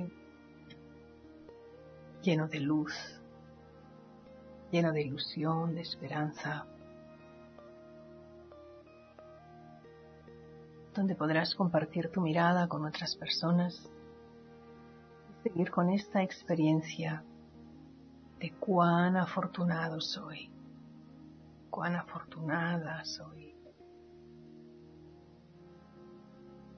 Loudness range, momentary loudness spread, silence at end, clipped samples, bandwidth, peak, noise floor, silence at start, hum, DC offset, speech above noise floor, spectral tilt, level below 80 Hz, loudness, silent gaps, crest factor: 16 LU; 25 LU; 0 s; under 0.1%; 6.4 kHz; -16 dBFS; -57 dBFS; 0 s; none; under 0.1%; 25 dB; -5 dB/octave; -70 dBFS; -33 LUFS; none; 20 dB